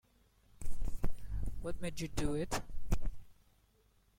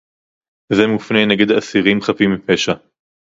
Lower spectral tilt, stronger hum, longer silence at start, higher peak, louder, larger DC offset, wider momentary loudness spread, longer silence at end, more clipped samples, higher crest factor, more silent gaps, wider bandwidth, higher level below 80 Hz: about the same, -5.5 dB/octave vs -5 dB/octave; neither; about the same, 0.6 s vs 0.7 s; second, -18 dBFS vs 0 dBFS; second, -42 LUFS vs -15 LUFS; neither; first, 12 LU vs 5 LU; first, 0.85 s vs 0.55 s; neither; about the same, 14 dB vs 16 dB; neither; first, 15 kHz vs 7.8 kHz; first, -42 dBFS vs -52 dBFS